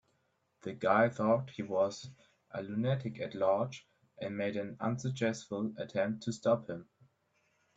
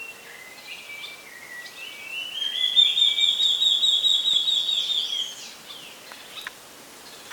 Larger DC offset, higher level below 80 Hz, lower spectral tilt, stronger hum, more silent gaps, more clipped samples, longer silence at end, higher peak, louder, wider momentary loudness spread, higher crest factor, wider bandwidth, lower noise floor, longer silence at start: neither; about the same, -74 dBFS vs -74 dBFS; first, -6.5 dB/octave vs 2 dB/octave; neither; neither; neither; first, 0.95 s vs 0 s; second, -12 dBFS vs -8 dBFS; second, -34 LUFS vs -19 LUFS; second, 16 LU vs 23 LU; about the same, 22 dB vs 18 dB; second, 8 kHz vs 19 kHz; first, -77 dBFS vs -45 dBFS; first, 0.65 s vs 0 s